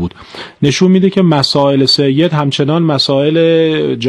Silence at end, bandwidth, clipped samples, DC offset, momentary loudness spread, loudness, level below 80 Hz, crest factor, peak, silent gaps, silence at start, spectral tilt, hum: 0 s; 12 kHz; under 0.1%; under 0.1%; 6 LU; -11 LUFS; -48 dBFS; 10 dB; 0 dBFS; none; 0 s; -6 dB/octave; none